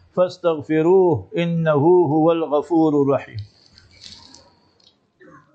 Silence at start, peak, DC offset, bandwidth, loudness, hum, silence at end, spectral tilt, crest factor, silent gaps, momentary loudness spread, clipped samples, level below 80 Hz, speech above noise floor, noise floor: 0.15 s; -4 dBFS; under 0.1%; 8 kHz; -18 LUFS; none; 1.45 s; -8.5 dB/octave; 14 dB; none; 8 LU; under 0.1%; -64 dBFS; 41 dB; -58 dBFS